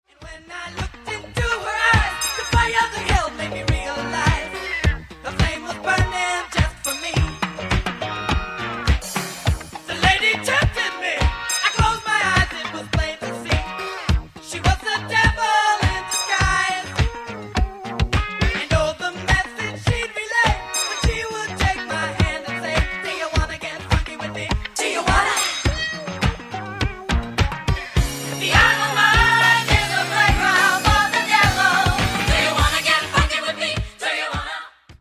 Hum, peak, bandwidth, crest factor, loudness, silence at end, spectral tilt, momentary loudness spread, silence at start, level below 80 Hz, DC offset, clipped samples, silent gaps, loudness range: none; 0 dBFS; 16 kHz; 20 dB; -20 LUFS; 0.05 s; -3.5 dB/octave; 11 LU; 0.2 s; -28 dBFS; under 0.1%; under 0.1%; none; 6 LU